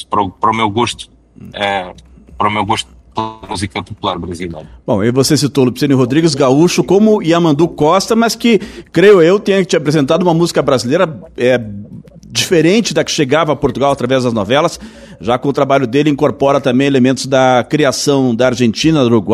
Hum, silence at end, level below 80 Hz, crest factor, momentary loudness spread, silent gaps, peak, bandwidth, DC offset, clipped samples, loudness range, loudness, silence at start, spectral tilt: none; 0 s; -44 dBFS; 12 dB; 11 LU; none; 0 dBFS; 14 kHz; under 0.1%; under 0.1%; 7 LU; -12 LUFS; 0 s; -5 dB/octave